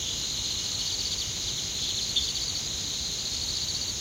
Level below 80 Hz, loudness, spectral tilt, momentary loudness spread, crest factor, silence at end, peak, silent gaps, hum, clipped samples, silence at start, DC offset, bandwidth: -48 dBFS; -28 LUFS; -0.5 dB/octave; 3 LU; 18 dB; 0 s; -12 dBFS; none; none; under 0.1%; 0 s; under 0.1%; 16 kHz